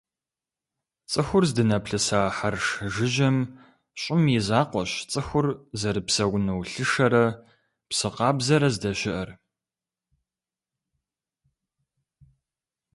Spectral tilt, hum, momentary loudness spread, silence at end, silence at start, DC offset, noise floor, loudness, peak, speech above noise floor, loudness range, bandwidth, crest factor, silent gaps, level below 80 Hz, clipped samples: -5 dB/octave; none; 8 LU; 3.6 s; 1.1 s; under 0.1%; under -90 dBFS; -24 LUFS; -6 dBFS; over 66 dB; 4 LU; 11.5 kHz; 20 dB; none; -52 dBFS; under 0.1%